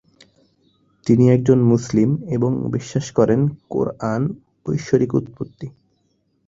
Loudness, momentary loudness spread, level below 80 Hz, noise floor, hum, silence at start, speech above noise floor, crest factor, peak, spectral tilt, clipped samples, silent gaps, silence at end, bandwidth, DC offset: -19 LUFS; 17 LU; -50 dBFS; -66 dBFS; none; 1.05 s; 48 dB; 18 dB; -2 dBFS; -8 dB/octave; under 0.1%; none; 0.75 s; 7.8 kHz; under 0.1%